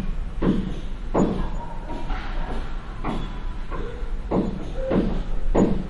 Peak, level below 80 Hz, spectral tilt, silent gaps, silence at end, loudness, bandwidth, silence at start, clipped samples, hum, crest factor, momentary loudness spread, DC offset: -6 dBFS; -28 dBFS; -7.5 dB/octave; none; 0 s; -28 LUFS; 7.4 kHz; 0 s; under 0.1%; none; 18 dB; 11 LU; under 0.1%